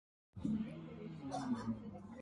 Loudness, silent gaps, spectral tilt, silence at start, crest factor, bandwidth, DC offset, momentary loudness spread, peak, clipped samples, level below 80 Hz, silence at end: -44 LUFS; none; -7 dB/octave; 0.35 s; 18 dB; 11 kHz; under 0.1%; 9 LU; -26 dBFS; under 0.1%; -64 dBFS; 0 s